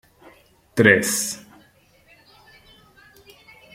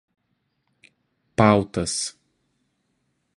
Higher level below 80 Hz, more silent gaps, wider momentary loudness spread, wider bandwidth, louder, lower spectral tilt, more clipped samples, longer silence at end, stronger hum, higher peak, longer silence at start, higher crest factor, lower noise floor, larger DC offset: second, -60 dBFS vs -52 dBFS; neither; first, 15 LU vs 12 LU; first, 16.5 kHz vs 11.5 kHz; first, -18 LUFS vs -22 LUFS; second, -3.5 dB/octave vs -5 dB/octave; neither; first, 2.35 s vs 1.25 s; neither; about the same, -2 dBFS vs -2 dBFS; second, 0.75 s vs 1.4 s; about the same, 24 dB vs 26 dB; second, -56 dBFS vs -73 dBFS; neither